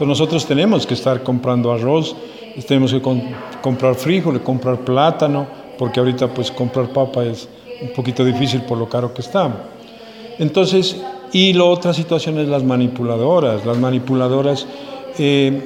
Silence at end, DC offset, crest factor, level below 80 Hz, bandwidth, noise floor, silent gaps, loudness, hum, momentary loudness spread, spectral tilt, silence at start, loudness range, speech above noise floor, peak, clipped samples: 0 s; under 0.1%; 16 dB; -56 dBFS; 16 kHz; -37 dBFS; none; -17 LUFS; none; 15 LU; -6.5 dB/octave; 0 s; 4 LU; 20 dB; -2 dBFS; under 0.1%